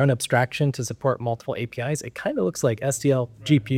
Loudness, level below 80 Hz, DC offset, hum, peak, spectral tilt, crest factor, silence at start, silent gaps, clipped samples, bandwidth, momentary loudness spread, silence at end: -24 LUFS; -58 dBFS; under 0.1%; none; -4 dBFS; -5.5 dB/octave; 18 dB; 0 s; none; under 0.1%; 16 kHz; 7 LU; 0 s